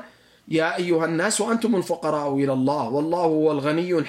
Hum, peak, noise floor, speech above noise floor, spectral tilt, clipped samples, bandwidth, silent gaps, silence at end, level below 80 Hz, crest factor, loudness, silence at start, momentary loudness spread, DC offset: none; -8 dBFS; -47 dBFS; 25 dB; -5 dB/octave; under 0.1%; 16 kHz; none; 0 s; -68 dBFS; 14 dB; -22 LUFS; 0 s; 3 LU; under 0.1%